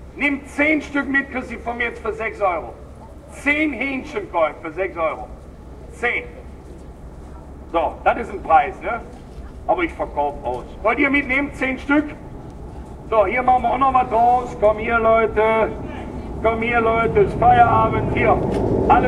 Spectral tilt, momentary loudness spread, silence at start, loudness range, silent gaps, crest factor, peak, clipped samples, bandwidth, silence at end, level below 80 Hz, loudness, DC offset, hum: -7 dB/octave; 22 LU; 0 s; 8 LU; none; 18 dB; -2 dBFS; under 0.1%; 11.5 kHz; 0 s; -36 dBFS; -19 LUFS; under 0.1%; none